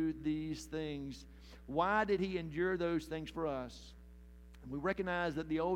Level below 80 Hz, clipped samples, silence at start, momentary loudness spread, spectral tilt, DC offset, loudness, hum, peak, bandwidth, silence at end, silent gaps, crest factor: -56 dBFS; under 0.1%; 0 s; 21 LU; -6 dB/octave; under 0.1%; -38 LUFS; none; -18 dBFS; 15.5 kHz; 0 s; none; 18 dB